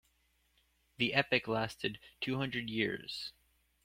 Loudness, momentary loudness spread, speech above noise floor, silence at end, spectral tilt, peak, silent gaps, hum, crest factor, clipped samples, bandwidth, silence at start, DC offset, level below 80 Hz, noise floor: -35 LUFS; 11 LU; 39 dB; 0.55 s; -5 dB/octave; -12 dBFS; none; none; 26 dB; under 0.1%; 16.5 kHz; 1 s; under 0.1%; -68 dBFS; -75 dBFS